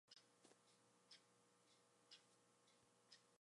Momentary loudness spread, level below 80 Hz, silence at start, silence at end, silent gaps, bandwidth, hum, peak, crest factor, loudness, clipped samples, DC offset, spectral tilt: 1 LU; under -90 dBFS; 0.05 s; 0.05 s; none; 11.5 kHz; none; -50 dBFS; 24 dB; -69 LUFS; under 0.1%; under 0.1%; -1.5 dB/octave